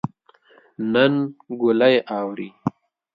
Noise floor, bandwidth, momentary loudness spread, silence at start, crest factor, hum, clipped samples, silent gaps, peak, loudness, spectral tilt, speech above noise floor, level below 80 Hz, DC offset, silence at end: -55 dBFS; 5.4 kHz; 13 LU; 0.05 s; 20 dB; none; under 0.1%; none; -2 dBFS; -21 LUFS; -8.5 dB/octave; 35 dB; -66 dBFS; under 0.1%; 0.45 s